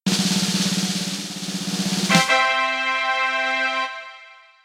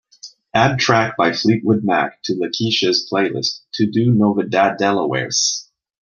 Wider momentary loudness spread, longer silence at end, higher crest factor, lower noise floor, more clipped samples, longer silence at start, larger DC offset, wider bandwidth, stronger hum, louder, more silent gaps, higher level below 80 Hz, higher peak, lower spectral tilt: first, 11 LU vs 7 LU; about the same, 0.3 s vs 0.4 s; about the same, 20 dB vs 16 dB; first, -46 dBFS vs -42 dBFS; neither; second, 0.05 s vs 0.25 s; neither; first, 16 kHz vs 7.2 kHz; neither; second, -20 LUFS vs -17 LUFS; neither; second, -68 dBFS vs -58 dBFS; about the same, -2 dBFS vs -2 dBFS; about the same, -3 dB/octave vs -4 dB/octave